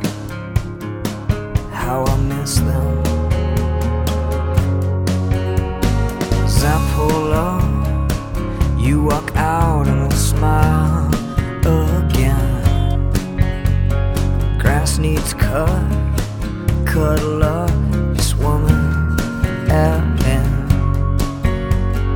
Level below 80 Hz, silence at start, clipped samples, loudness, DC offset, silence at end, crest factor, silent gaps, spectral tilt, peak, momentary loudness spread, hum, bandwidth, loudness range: -20 dBFS; 0 s; under 0.1%; -18 LUFS; under 0.1%; 0 s; 16 dB; none; -6.5 dB/octave; 0 dBFS; 6 LU; none; 17.5 kHz; 2 LU